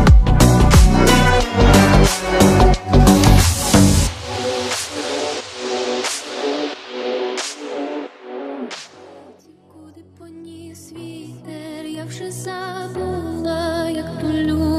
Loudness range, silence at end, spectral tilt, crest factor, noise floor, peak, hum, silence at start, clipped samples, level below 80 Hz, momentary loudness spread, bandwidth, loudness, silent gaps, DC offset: 22 LU; 0 s; -5 dB/octave; 16 dB; -47 dBFS; 0 dBFS; none; 0 s; under 0.1%; -22 dBFS; 21 LU; 15.5 kHz; -16 LUFS; none; under 0.1%